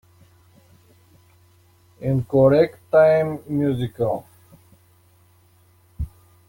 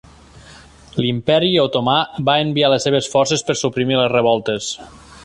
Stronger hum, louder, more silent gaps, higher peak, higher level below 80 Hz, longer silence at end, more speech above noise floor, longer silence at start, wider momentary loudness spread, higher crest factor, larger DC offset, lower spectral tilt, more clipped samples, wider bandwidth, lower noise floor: neither; second, -20 LUFS vs -17 LUFS; neither; about the same, -4 dBFS vs -2 dBFS; about the same, -46 dBFS vs -50 dBFS; first, 0.4 s vs 0 s; first, 38 dB vs 26 dB; first, 2 s vs 0.5 s; first, 19 LU vs 8 LU; about the same, 18 dB vs 16 dB; neither; first, -9 dB/octave vs -4.5 dB/octave; neither; first, 17 kHz vs 11.5 kHz; first, -56 dBFS vs -43 dBFS